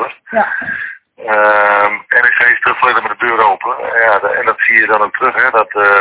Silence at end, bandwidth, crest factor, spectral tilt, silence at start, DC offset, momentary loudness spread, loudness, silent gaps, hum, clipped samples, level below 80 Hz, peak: 0 s; 4 kHz; 12 dB; -6 dB/octave; 0 s; under 0.1%; 9 LU; -11 LUFS; none; none; 0.6%; -56 dBFS; 0 dBFS